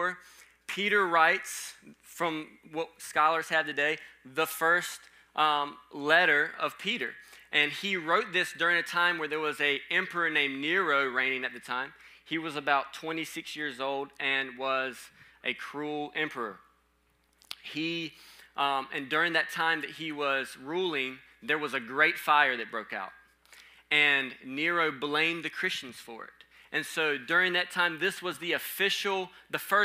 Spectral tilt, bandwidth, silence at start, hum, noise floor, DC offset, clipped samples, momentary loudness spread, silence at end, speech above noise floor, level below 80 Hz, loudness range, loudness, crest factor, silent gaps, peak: -2.5 dB/octave; 16 kHz; 0 s; none; -70 dBFS; under 0.1%; under 0.1%; 14 LU; 0 s; 40 dB; -76 dBFS; 6 LU; -29 LUFS; 22 dB; none; -8 dBFS